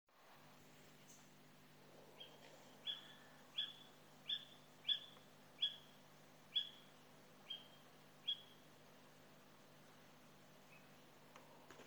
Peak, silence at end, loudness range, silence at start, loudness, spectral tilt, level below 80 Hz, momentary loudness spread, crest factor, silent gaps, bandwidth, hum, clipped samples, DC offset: -28 dBFS; 0 s; 10 LU; 0.05 s; -46 LUFS; -2 dB/octave; under -90 dBFS; 22 LU; 26 dB; none; over 20 kHz; 50 Hz at -75 dBFS; under 0.1%; under 0.1%